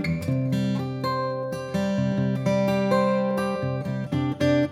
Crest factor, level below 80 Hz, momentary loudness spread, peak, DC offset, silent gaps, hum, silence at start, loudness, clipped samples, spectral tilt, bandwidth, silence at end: 16 dB; -60 dBFS; 6 LU; -8 dBFS; under 0.1%; none; none; 0 s; -25 LUFS; under 0.1%; -7.5 dB/octave; 15 kHz; 0 s